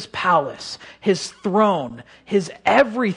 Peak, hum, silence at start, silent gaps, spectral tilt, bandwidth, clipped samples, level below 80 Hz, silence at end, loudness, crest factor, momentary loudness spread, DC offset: -2 dBFS; none; 0 s; none; -5 dB/octave; 11 kHz; under 0.1%; -60 dBFS; 0 s; -20 LUFS; 18 dB; 16 LU; under 0.1%